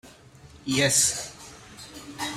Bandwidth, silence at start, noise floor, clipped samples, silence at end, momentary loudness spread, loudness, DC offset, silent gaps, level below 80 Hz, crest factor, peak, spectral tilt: 16 kHz; 0.05 s; -50 dBFS; under 0.1%; 0 s; 24 LU; -23 LUFS; under 0.1%; none; -58 dBFS; 22 dB; -8 dBFS; -2 dB/octave